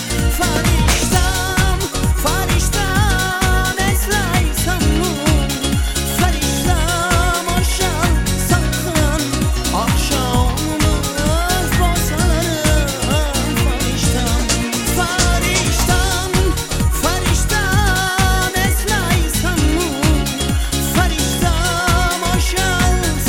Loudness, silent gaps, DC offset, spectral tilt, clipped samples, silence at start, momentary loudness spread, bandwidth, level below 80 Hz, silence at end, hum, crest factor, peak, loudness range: -16 LUFS; none; under 0.1%; -4 dB/octave; under 0.1%; 0 s; 2 LU; 17 kHz; -20 dBFS; 0 s; none; 16 dB; 0 dBFS; 1 LU